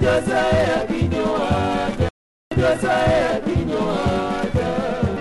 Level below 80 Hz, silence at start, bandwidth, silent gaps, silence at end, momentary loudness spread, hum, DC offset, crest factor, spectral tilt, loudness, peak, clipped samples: -34 dBFS; 0 s; 11.5 kHz; 2.10-2.51 s; 0 s; 5 LU; none; under 0.1%; 14 dB; -6.5 dB/octave; -20 LUFS; -6 dBFS; under 0.1%